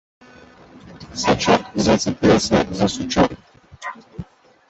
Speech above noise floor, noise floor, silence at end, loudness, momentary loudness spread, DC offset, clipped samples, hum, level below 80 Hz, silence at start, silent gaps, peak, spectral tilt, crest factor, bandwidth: 28 dB; -46 dBFS; 0.45 s; -18 LUFS; 20 LU; under 0.1%; under 0.1%; none; -42 dBFS; 0.85 s; none; -2 dBFS; -4.5 dB/octave; 18 dB; 8.2 kHz